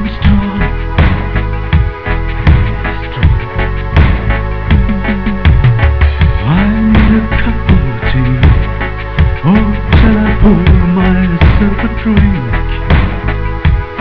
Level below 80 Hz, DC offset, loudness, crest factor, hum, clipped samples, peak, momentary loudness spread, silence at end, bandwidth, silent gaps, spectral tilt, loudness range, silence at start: -14 dBFS; 1%; -11 LUFS; 10 dB; none; 0.4%; 0 dBFS; 7 LU; 0 s; 5.4 kHz; none; -9.5 dB/octave; 3 LU; 0 s